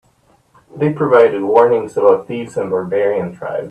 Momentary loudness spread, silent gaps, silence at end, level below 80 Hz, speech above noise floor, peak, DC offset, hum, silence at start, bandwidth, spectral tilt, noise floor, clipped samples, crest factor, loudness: 11 LU; none; 0 s; -58 dBFS; 41 dB; 0 dBFS; under 0.1%; none; 0.75 s; 9 kHz; -7.5 dB/octave; -55 dBFS; under 0.1%; 16 dB; -15 LUFS